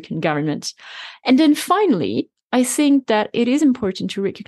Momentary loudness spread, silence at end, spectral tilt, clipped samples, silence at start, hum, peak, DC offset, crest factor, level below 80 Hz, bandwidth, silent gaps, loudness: 11 LU; 0.05 s; -4.5 dB/octave; under 0.1%; 0 s; none; -4 dBFS; under 0.1%; 14 dB; -62 dBFS; 12.5 kHz; 2.43-2.48 s; -18 LUFS